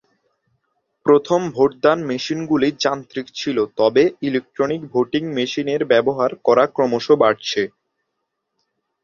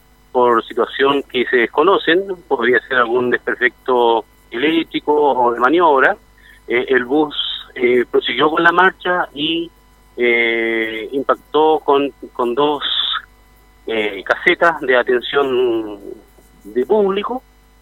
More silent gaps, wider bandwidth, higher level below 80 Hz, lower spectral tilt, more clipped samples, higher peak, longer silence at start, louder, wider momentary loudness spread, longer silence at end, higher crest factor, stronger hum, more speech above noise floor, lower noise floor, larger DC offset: neither; second, 7.2 kHz vs 15.5 kHz; second, -60 dBFS vs -52 dBFS; about the same, -5 dB/octave vs -5.5 dB/octave; neither; about the same, 0 dBFS vs 0 dBFS; first, 1.05 s vs 0.35 s; second, -19 LUFS vs -16 LUFS; about the same, 8 LU vs 10 LU; first, 1.35 s vs 0.4 s; about the same, 18 dB vs 16 dB; neither; first, 58 dB vs 32 dB; first, -76 dBFS vs -48 dBFS; neither